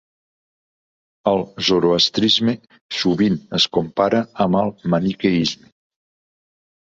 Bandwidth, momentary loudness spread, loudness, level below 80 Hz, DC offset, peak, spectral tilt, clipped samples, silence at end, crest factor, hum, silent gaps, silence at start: 7.8 kHz; 7 LU; -18 LUFS; -54 dBFS; under 0.1%; -2 dBFS; -5 dB/octave; under 0.1%; 1.4 s; 18 dB; none; 2.81-2.89 s; 1.25 s